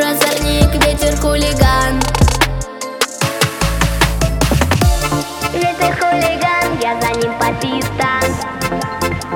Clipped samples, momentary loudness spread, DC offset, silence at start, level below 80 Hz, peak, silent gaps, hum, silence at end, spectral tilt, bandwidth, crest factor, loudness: under 0.1%; 6 LU; under 0.1%; 0 s; -22 dBFS; 0 dBFS; none; none; 0 s; -4.5 dB/octave; 19 kHz; 14 dB; -15 LUFS